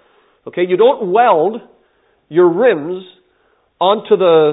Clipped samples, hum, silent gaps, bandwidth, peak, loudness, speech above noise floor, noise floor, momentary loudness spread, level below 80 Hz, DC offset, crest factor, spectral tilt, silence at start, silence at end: under 0.1%; none; none; 4 kHz; 0 dBFS; -13 LUFS; 46 dB; -58 dBFS; 15 LU; -70 dBFS; under 0.1%; 14 dB; -11 dB/octave; 0.45 s; 0 s